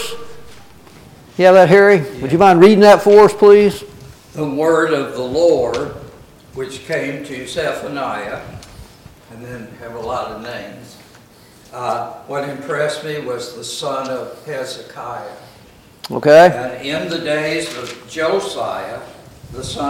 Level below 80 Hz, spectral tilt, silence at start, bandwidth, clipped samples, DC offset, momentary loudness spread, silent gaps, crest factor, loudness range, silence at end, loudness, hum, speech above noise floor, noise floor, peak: -48 dBFS; -5.5 dB/octave; 0 s; 16 kHz; under 0.1%; under 0.1%; 23 LU; none; 16 dB; 17 LU; 0 s; -14 LUFS; none; 30 dB; -45 dBFS; 0 dBFS